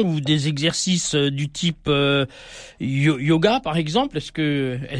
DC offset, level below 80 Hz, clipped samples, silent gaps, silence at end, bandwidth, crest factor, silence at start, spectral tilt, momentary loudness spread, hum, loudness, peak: under 0.1%; -48 dBFS; under 0.1%; none; 0 s; 10.5 kHz; 18 dB; 0 s; -5 dB/octave; 8 LU; none; -21 LUFS; -4 dBFS